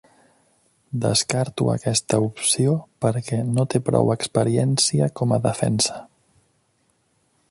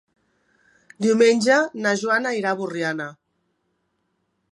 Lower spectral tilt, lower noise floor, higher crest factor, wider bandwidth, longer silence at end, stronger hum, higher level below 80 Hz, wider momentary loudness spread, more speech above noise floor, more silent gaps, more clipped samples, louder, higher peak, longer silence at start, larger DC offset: about the same, -5 dB/octave vs -4 dB/octave; second, -66 dBFS vs -72 dBFS; about the same, 20 dB vs 18 dB; about the same, 11.5 kHz vs 11.5 kHz; about the same, 1.45 s vs 1.4 s; neither; first, -54 dBFS vs -72 dBFS; second, 5 LU vs 10 LU; second, 45 dB vs 52 dB; neither; neither; about the same, -21 LUFS vs -20 LUFS; about the same, -4 dBFS vs -4 dBFS; about the same, 0.9 s vs 1 s; neither